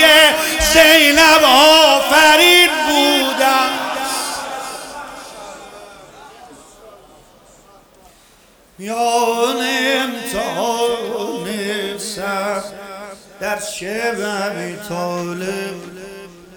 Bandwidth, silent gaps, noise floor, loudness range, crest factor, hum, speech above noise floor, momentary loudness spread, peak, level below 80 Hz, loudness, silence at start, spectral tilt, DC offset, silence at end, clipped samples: 19.5 kHz; none; -49 dBFS; 17 LU; 16 dB; none; 35 dB; 23 LU; 0 dBFS; -42 dBFS; -13 LUFS; 0 s; -1.5 dB/octave; under 0.1%; 0.3 s; under 0.1%